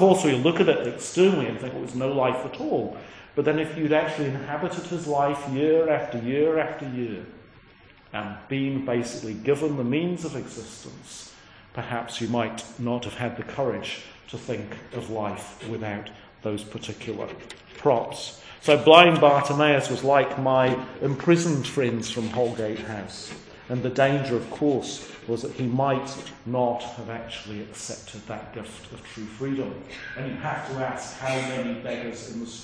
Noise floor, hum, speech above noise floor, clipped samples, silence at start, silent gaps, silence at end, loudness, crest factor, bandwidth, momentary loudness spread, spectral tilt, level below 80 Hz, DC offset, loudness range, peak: -52 dBFS; none; 28 dB; under 0.1%; 0 s; none; 0 s; -25 LUFS; 26 dB; 10.5 kHz; 16 LU; -5.5 dB/octave; -58 dBFS; under 0.1%; 13 LU; 0 dBFS